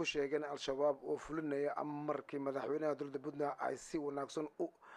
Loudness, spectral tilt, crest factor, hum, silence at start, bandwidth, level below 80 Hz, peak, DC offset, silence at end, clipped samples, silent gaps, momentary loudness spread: -40 LUFS; -5 dB/octave; 16 dB; none; 0 s; 11.5 kHz; -72 dBFS; -24 dBFS; under 0.1%; 0 s; under 0.1%; none; 6 LU